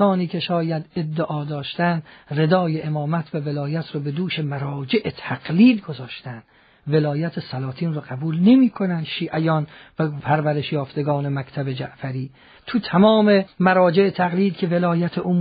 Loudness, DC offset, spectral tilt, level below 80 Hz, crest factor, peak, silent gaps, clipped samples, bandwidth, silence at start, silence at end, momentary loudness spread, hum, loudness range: -21 LUFS; under 0.1%; -6 dB/octave; -60 dBFS; 18 dB; -2 dBFS; none; under 0.1%; 5 kHz; 0 s; 0 s; 14 LU; none; 5 LU